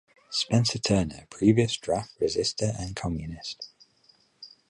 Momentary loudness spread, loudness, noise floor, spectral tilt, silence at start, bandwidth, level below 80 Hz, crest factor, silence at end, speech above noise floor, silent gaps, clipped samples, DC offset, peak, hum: 14 LU; -27 LUFS; -63 dBFS; -5 dB/octave; 0.3 s; 11.5 kHz; -48 dBFS; 20 dB; 0.2 s; 36 dB; none; under 0.1%; under 0.1%; -8 dBFS; none